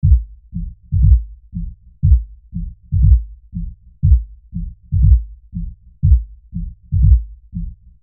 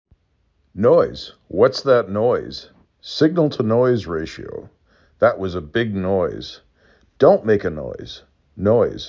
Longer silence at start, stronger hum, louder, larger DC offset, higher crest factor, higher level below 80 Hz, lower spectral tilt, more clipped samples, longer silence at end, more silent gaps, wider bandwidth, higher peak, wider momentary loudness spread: second, 0.05 s vs 0.75 s; neither; first, -16 LUFS vs -19 LUFS; neither; about the same, 16 dB vs 18 dB; first, -18 dBFS vs -46 dBFS; first, -30 dB/octave vs -7 dB/octave; neither; first, 0.3 s vs 0 s; neither; second, 0.3 kHz vs 7.6 kHz; about the same, 0 dBFS vs -2 dBFS; about the same, 17 LU vs 19 LU